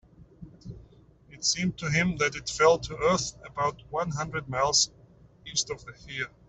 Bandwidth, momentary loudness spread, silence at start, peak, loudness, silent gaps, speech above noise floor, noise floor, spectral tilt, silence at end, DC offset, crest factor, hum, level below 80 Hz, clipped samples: 8.4 kHz; 17 LU; 0.4 s; -8 dBFS; -27 LUFS; none; 28 dB; -55 dBFS; -3 dB/octave; 0.2 s; under 0.1%; 22 dB; none; -54 dBFS; under 0.1%